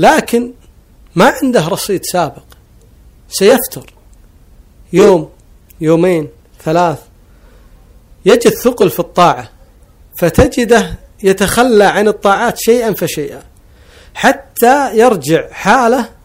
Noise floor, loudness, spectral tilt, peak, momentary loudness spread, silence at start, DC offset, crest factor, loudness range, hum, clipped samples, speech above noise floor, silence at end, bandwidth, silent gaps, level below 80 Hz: -42 dBFS; -11 LUFS; -4.5 dB/octave; 0 dBFS; 13 LU; 0 s; under 0.1%; 12 dB; 4 LU; none; 1%; 32 dB; 0.15 s; 16.5 kHz; none; -36 dBFS